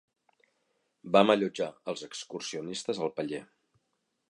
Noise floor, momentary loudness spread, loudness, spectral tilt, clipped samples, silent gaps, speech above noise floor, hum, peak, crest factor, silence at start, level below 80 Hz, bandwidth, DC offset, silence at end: -79 dBFS; 15 LU; -30 LUFS; -4.5 dB/octave; under 0.1%; none; 50 dB; none; -8 dBFS; 24 dB; 1.05 s; -76 dBFS; 11.5 kHz; under 0.1%; 0.85 s